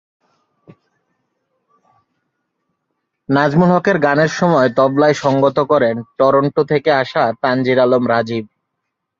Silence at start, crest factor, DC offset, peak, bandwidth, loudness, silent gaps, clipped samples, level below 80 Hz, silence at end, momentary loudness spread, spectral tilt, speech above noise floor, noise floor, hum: 3.3 s; 14 dB; under 0.1%; -2 dBFS; 7.6 kHz; -14 LUFS; none; under 0.1%; -56 dBFS; 0.75 s; 4 LU; -6.5 dB/octave; 62 dB; -75 dBFS; none